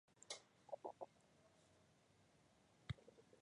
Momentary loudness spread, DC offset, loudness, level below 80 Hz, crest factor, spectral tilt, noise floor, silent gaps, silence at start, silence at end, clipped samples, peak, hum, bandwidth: 7 LU; under 0.1%; -57 LUFS; -74 dBFS; 24 dB; -4 dB/octave; -75 dBFS; none; 0.15 s; 0 s; under 0.1%; -36 dBFS; none; 11 kHz